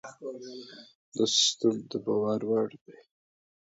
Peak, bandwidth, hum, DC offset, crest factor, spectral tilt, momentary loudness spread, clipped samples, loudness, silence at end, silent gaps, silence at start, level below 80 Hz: -12 dBFS; 8 kHz; none; under 0.1%; 18 dB; -3 dB/octave; 20 LU; under 0.1%; -27 LUFS; 0.85 s; 0.95-1.12 s, 2.81-2.85 s; 0.05 s; -76 dBFS